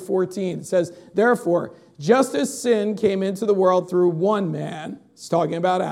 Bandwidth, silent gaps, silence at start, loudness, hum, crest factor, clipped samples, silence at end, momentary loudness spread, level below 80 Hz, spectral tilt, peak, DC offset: 15 kHz; none; 0 s; -21 LUFS; none; 18 dB; under 0.1%; 0 s; 11 LU; -68 dBFS; -6 dB/octave; -2 dBFS; under 0.1%